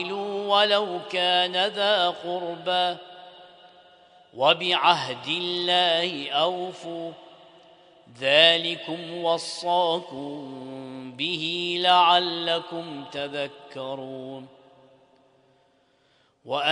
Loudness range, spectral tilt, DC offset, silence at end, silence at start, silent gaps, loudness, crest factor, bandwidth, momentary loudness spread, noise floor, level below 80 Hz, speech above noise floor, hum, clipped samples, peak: 9 LU; -3.5 dB/octave; under 0.1%; 0 s; 0 s; none; -23 LUFS; 22 dB; 10.5 kHz; 18 LU; -64 dBFS; -74 dBFS; 40 dB; none; under 0.1%; -2 dBFS